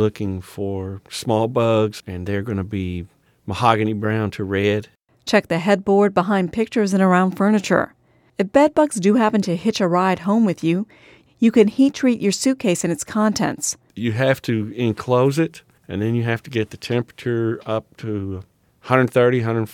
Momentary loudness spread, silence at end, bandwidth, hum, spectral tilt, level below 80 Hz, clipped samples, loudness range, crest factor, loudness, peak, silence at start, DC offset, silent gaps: 11 LU; 0 s; 16.5 kHz; none; -6 dB/octave; -56 dBFS; under 0.1%; 5 LU; 18 dB; -20 LUFS; 0 dBFS; 0 s; under 0.1%; none